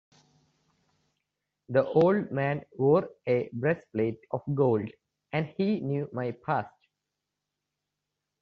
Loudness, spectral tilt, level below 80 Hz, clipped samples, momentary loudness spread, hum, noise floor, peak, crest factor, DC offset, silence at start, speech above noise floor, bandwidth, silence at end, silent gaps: -28 LUFS; -7 dB/octave; -70 dBFS; under 0.1%; 10 LU; 50 Hz at -55 dBFS; -86 dBFS; -10 dBFS; 20 dB; under 0.1%; 1.7 s; 58 dB; 6.4 kHz; 1.75 s; none